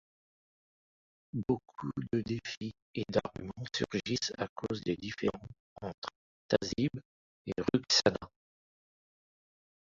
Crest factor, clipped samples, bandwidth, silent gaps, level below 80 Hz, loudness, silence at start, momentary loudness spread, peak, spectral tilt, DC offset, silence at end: 26 dB; under 0.1%; 7.8 kHz; 2.57-2.61 s, 2.82-2.94 s, 4.49-4.56 s, 5.60-5.76 s, 5.94-6.02 s, 6.16-6.49 s, 7.05-7.45 s; -62 dBFS; -34 LUFS; 1.35 s; 16 LU; -10 dBFS; -4.5 dB/octave; under 0.1%; 1.55 s